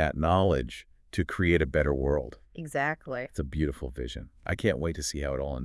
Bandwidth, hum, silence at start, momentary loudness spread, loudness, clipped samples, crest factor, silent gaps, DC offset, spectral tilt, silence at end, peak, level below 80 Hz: 12 kHz; none; 0 s; 14 LU; -29 LUFS; under 0.1%; 18 dB; none; under 0.1%; -6 dB/octave; 0 s; -10 dBFS; -40 dBFS